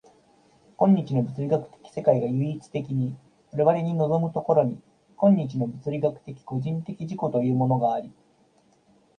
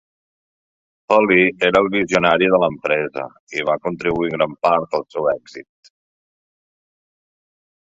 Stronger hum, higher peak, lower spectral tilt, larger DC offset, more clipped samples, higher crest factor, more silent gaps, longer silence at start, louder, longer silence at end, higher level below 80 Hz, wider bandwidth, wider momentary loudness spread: neither; second, -6 dBFS vs -2 dBFS; first, -10 dB/octave vs -5.5 dB/octave; neither; neither; about the same, 20 dB vs 18 dB; second, none vs 3.40-3.47 s; second, 0.8 s vs 1.1 s; second, -25 LUFS vs -18 LUFS; second, 1.1 s vs 2.2 s; second, -64 dBFS vs -54 dBFS; first, 9.2 kHz vs 7.8 kHz; about the same, 12 LU vs 11 LU